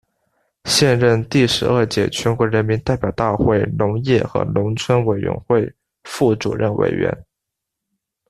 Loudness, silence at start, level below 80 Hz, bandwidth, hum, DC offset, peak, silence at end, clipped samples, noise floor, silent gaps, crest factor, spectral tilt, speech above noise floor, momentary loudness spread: -18 LUFS; 0.65 s; -44 dBFS; 14 kHz; none; under 0.1%; -2 dBFS; 1.1 s; under 0.1%; -81 dBFS; none; 16 dB; -5.5 dB/octave; 64 dB; 6 LU